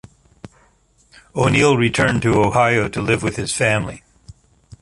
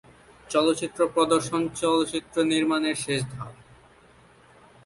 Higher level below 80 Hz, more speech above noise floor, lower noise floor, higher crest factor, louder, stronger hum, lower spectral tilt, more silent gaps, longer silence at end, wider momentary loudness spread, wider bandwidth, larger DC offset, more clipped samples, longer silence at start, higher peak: first, -42 dBFS vs -60 dBFS; first, 40 dB vs 31 dB; about the same, -57 dBFS vs -55 dBFS; about the same, 18 dB vs 18 dB; first, -17 LUFS vs -25 LUFS; neither; about the same, -5 dB/octave vs -4.5 dB/octave; neither; second, 0.85 s vs 1.3 s; about the same, 7 LU vs 6 LU; about the same, 11.5 kHz vs 11.5 kHz; neither; neither; about the same, 0.45 s vs 0.5 s; first, -2 dBFS vs -8 dBFS